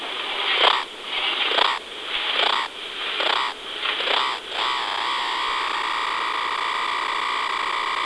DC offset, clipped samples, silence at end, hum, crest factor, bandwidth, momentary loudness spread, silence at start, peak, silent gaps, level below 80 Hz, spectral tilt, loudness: under 0.1%; under 0.1%; 0 s; none; 22 dB; 11 kHz; 7 LU; 0 s; -2 dBFS; none; -62 dBFS; 0 dB/octave; -22 LUFS